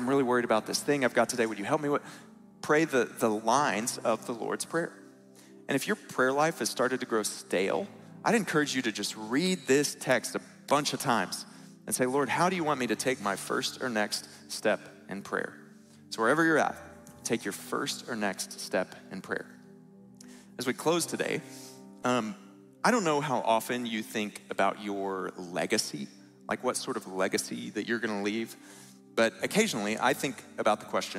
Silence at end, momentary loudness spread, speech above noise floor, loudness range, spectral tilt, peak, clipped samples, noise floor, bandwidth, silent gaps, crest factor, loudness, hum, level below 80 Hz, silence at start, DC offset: 0 s; 13 LU; 24 dB; 5 LU; -3.5 dB/octave; -8 dBFS; under 0.1%; -54 dBFS; 16 kHz; none; 22 dB; -30 LUFS; none; -76 dBFS; 0 s; under 0.1%